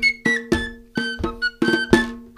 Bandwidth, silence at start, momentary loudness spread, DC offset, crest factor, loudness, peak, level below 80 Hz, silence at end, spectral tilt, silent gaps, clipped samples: 15 kHz; 0 s; 8 LU; under 0.1%; 22 dB; -21 LUFS; 0 dBFS; -38 dBFS; 0.1 s; -4.5 dB/octave; none; under 0.1%